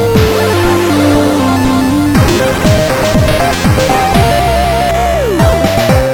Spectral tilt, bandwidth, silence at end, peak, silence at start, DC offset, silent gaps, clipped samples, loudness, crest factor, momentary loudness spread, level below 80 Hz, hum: -5.5 dB/octave; 18.5 kHz; 0 s; 0 dBFS; 0 s; under 0.1%; none; under 0.1%; -10 LUFS; 10 dB; 2 LU; -20 dBFS; none